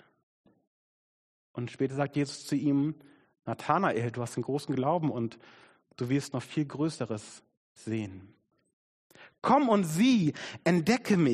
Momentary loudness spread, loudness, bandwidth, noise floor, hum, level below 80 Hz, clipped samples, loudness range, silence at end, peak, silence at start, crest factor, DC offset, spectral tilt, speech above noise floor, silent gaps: 15 LU; -30 LUFS; 13 kHz; under -90 dBFS; none; -70 dBFS; under 0.1%; 7 LU; 0 s; -10 dBFS; 1.55 s; 20 dB; under 0.1%; -6 dB/octave; over 61 dB; 7.57-7.75 s, 8.73-9.10 s